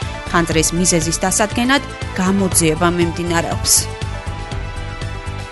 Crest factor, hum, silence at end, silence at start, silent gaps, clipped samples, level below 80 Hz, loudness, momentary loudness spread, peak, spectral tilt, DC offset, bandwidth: 16 dB; none; 0 s; 0 s; none; under 0.1%; -30 dBFS; -17 LUFS; 13 LU; 0 dBFS; -3.5 dB/octave; under 0.1%; 12 kHz